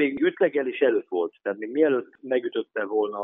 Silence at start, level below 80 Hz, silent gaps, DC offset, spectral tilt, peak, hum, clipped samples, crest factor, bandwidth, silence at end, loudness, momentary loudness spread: 0 s; -76 dBFS; none; under 0.1%; -3.5 dB/octave; -8 dBFS; none; under 0.1%; 16 dB; 3.9 kHz; 0 s; -25 LUFS; 7 LU